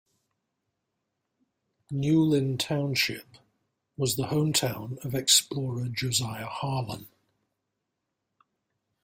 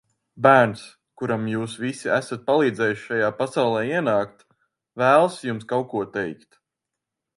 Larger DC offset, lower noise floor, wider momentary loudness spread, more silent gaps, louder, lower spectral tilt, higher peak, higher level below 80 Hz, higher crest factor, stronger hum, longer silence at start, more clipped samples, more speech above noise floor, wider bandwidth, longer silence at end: neither; about the same, -83 dBFS vs -85 dBFS; about the same, 14 LU vs 13 LU; neither; second, -27 LUFS vs -22 LUFS; second, -4 dB/octave vs -6 dB/octave; second, -6 dBFS vs 0 dBFS; about the same, -64 dBFS vs -66 dBFS; about the same, 24 dB vs 22 dB; neither; first, 1.9 s vs 0.35 s; neither; second, 55 dB vs 63 dB; first, 16 kHz vs 11.5 kHz; first, 1.95 s vs 1.05 s